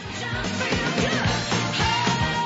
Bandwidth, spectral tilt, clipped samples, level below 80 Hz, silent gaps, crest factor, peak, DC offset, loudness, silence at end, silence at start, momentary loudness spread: 8 kHz; -4 dB/octave; under 0.1%; -40 dBFS; none; 14 dB; -10 dBFS; under 0.1%; -23 LUFS; 0 s; 0 s; 5 LU